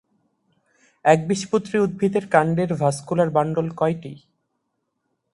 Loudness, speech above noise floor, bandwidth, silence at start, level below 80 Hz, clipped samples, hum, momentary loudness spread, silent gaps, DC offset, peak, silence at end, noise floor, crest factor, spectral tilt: -21 LUFS; 55 dB; 11.5 kHz; 1.05 s; -58 dBFS; under 0.1%; none; 5 LU; none; under 0.1%; -2 dBFS; 1.15 s; -75 dBFS; 22 dB; -6.5 dB/octave